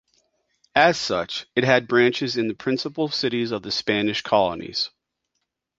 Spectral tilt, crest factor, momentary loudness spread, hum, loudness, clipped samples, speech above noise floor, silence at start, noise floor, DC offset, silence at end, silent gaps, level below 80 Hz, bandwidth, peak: -4.5 dB/octave; 22 dB; 8 LU; none; -22 LUFS; under 0.1%; 56 dB; 0.75 s; -78 dBFS; under 0.1%; 0.9 s; none; -58 dBFS; 7.8 kHz; -2 dBFS